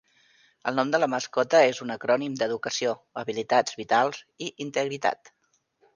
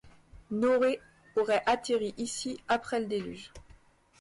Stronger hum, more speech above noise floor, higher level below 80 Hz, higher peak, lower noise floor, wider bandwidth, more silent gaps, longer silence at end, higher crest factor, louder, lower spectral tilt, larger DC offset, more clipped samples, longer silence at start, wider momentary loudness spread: neither; first, 42 dB vs 29 dB; second, -74 dBFS vs -60 dBFS; first, -6 dBFS vs -16 dBFS; first, -68 dBFS vs -59 dBFS; second, 9.8 kHz vs 11.5 kHz; neither; first, 0.8 s vs 0.6 s; first, 20 dB vs 14 dB; first, -26 LUFS vs -30 LUFS; about the same, -3.5 dB/octave vs -4 dB/octave; neither; neither; first, 0.65 s vs 0.05 s; about the same, 12 LU vs 12 LU